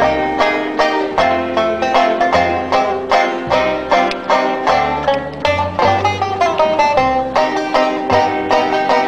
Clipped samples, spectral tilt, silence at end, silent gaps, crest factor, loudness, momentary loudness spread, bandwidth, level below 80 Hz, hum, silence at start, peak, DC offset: under 0.1%; -5 dB/octave; 0 s; none; 14 dB; -15 LUFS; 3 LU; 11.5 kHz; -42 dBFS; none; 0 s; 0 dBFS; under 0.1%